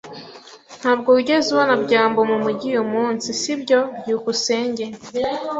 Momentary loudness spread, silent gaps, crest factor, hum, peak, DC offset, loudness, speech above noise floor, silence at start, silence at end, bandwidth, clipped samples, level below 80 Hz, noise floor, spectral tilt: 9 LU; none; 18 dB; none; -2 dBFS; under 0.1%; -19 LUFS; 23 dB; 0.05 s; 0 s; 8 kHz; under 0.1%; -62 dBFS; -42 dBFS; -3.5 dB/octave